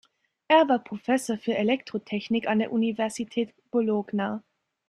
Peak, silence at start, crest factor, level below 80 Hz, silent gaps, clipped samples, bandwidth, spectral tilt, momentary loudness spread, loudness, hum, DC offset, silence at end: -8 dBFS; 0.5 s; 18 dB; -70 dBFS; none; under 0.1%; 12.5 kHz; -5 dB/octave; 10 LU; -26 LUFS; none; under 0.1%; 0.5 s